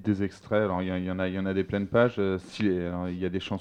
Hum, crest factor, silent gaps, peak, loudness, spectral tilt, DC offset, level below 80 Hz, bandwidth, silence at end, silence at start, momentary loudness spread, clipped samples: none; 20 dB; none; -8 dBFS; -28 LUFS; -7.5 dB/octave; under 0.1%; -56 dBFS; 9.6 kHz; 0 s; 0 s; 7 LU; under 0.1%